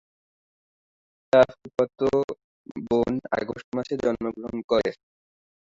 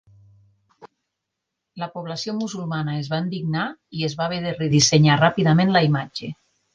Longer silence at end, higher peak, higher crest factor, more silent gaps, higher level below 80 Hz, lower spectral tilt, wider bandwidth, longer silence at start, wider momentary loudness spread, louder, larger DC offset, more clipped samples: first, 0.65 s vs 0.4 s; second, -6 dBFS vs -2 dBFS; about the same, 20 dB vs 20 dB; first, 2.24-2.28 s, 2.44-2.65 s, 3.64-3.72 s, 4.64-4.68 s vs none; about the same, -56 dBFS vs -56 dBFS; first, -6.5 dB/octave vs -5 dB/octave; second, 7.8 kHz vs 9.8 kHz; first, 1.35 s vs 0.8 s; about the same, 14 LU vs 16 LU; second, -25 LUFS vs -21 LUFS; neither; neither